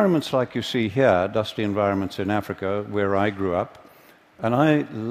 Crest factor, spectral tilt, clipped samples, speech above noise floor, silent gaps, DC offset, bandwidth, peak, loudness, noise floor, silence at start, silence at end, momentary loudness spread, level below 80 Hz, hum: 18 dB; -7 dB/octave; under 0.1%; 30 dB; none; under 0.1%; 15.5 kHz; -4 dBFS; -23 LUFS; -52 dBFS; 0 s; 0 s; 8 LU; -58 dBFS; none